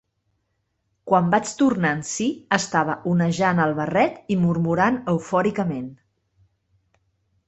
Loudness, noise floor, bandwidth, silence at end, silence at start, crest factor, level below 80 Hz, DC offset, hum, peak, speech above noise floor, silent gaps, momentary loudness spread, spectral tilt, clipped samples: -22 LUFS; -73 dBFS; 8.2 kHz; 1.55 s; 1.05 s; 20 dB; -60 dBFS; under 0.1%; none; -4 dBFS; 52 dB; none; 6 LU; -5.5 dB/octave; under 0.1%